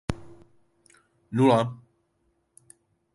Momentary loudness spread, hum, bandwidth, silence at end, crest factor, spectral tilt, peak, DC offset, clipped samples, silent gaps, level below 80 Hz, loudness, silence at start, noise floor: 21 LU; none; 11.5 kHz; 1.4 s; 22 dB; -7 dB/octave; -8 dBFS; under 0.1%; under 0.1%; none; -52 dBFS; -24 LUFS; 0.1 s; -72 dBFS